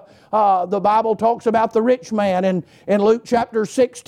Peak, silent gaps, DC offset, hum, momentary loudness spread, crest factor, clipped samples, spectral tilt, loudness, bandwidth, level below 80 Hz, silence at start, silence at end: -6 dBFS; none; under 0.1%; none; 5 LU; 12 dB; under 0.1%; -6 dB/octave; -18 LUFS; 13 kHz; -60 dBFS; 0.3 s; 0.1 s